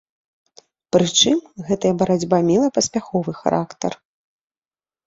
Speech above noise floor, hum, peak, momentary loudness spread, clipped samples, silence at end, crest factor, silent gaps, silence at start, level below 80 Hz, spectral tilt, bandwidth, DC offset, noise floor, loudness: over 71 dB; none; -2 dBFS; 11 LU; under 0.1%; 1.1 s; 18 dB; none; 0.95 s; -56 dBFS; -4.5 dB/octave; 8 kHz; under 0.1%; under -90 dBFS; -19 LUFS